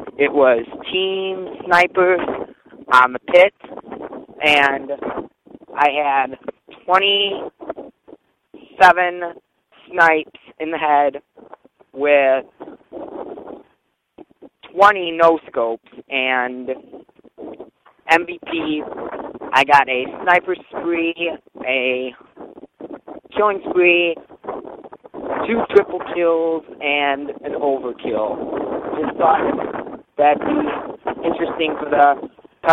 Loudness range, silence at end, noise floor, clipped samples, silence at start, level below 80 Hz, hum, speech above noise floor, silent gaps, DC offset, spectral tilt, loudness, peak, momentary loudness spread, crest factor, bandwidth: 5 LU; 0 s; -65 dBFS; under 0.1%; 0 s; -58 dBFS; none; 49 dB; none; under 0.1%; -4.5 dB/octave; -17 LUFS; 0 dBFS; 21 LU; 18 dB; 13.5 kHz